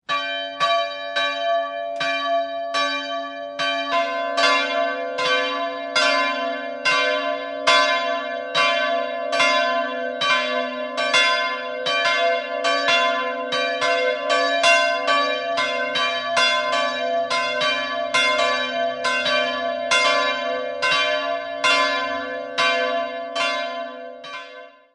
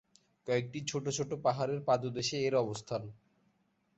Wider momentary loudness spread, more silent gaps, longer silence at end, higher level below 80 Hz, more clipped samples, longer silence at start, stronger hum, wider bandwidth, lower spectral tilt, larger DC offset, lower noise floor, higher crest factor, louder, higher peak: about the same, 8 LU vs 9 LU; neither; second, 0.25 s vs 0.85 s; about the same, -66 dBFS vs -70 dBFS; neither; second, 0.1 s vs 0.45 s; neither; first, 11.5 kHz vs 8.2 kHz; second, -1 dB/octave vs -4.5 dB/octave; neither; second, -42 dBFS vs -75 dBFS; about the same, 18 dB vs 18 dB; first, -20 LUFS vs -34 LUFS; first, -2 dBFS vs -18 dBFS